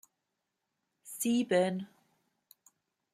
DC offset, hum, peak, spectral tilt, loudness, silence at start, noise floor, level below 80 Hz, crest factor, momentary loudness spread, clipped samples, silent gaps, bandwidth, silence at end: under 0.1%; none; -16 dBFS; -4.5 dB/octave; -31 LUFS; 1.05 s; -85 dBFS; -82 dBFS; 20 dB; 19 LU; under 0.1%; none; 16 kHz; 1.25 s